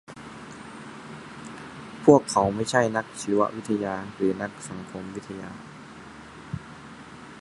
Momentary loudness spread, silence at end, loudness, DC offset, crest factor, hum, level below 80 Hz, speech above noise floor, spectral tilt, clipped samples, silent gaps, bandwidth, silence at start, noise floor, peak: 22 LU; 0 s; -25 LUFS; under 0.1%; 26 dB; none; -58 dBFS; 20 dB; -5.5 dB/octave; under 0.1%; none; 11.5 kHz; 0.1 s; -44 dBFS; -2 dBFS